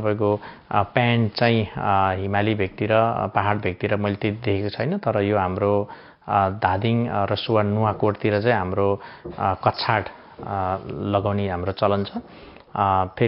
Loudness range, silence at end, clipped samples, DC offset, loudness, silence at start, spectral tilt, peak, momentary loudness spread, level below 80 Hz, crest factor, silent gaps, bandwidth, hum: 3 LU; 0 s; under 0.1%; under 0.1%; -22 LUFS; 0 s; -5 dB/octave; -2 dBFS; 7 LU; -56 dBFS; 20 dB; none; 5.6 kHz; none